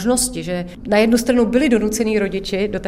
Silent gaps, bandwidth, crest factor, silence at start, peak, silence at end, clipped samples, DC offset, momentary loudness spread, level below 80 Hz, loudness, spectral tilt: none; 16 kHz; 16 dB; 0 s; -2 dBFS; 0 s; under 0.1%; under 0.1%; 8 LU; -38 dBFS; -18 LUFS; -4 dB/octave